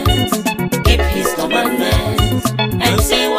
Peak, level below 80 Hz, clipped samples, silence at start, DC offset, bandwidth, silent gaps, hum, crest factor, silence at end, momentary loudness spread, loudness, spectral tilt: 0 dBFS; -22 dBFS; under 0.1%; 0 s; under 0.1%; 15.5 kHz; none; none; 14 dB; 0 s; 4 LU; -15 LUFS; -4.5 dB/octave